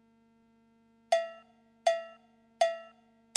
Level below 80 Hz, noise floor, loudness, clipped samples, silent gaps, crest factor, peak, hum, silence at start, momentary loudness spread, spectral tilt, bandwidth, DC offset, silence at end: -86 dBFS; -66 dBFS; -33 LUFS; under 0.1%; none; 24 dB; -10 dBFS; 50 Hz at -80 dBFS; 1.1 s; 16 LU; 0 dB/octave; 11.5 kHz; under 0.1%; 0.5 s